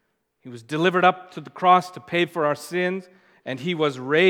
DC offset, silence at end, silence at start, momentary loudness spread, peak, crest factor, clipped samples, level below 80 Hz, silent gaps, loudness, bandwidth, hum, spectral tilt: under 0.1%; 0 s; 0.45 s; 19 LU; -4 dBFS; 20 dB; under 0.1%; -78 dBFS; none; -22 LUFS; 16.5 kHz; none; -5.5 dB/octave